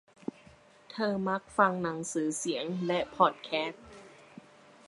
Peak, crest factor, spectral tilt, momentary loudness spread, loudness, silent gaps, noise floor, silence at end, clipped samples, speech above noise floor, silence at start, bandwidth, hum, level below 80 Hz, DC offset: -8 dBFS; 24 dB; -4.5 dB/octave; 20 LU; -31 LUFS; none; -58 dBFS; 0.75 s; under 0.1%; 27 dB; 0.9 s; 11.5 kHz; none; -68 dBFS; under 0.1%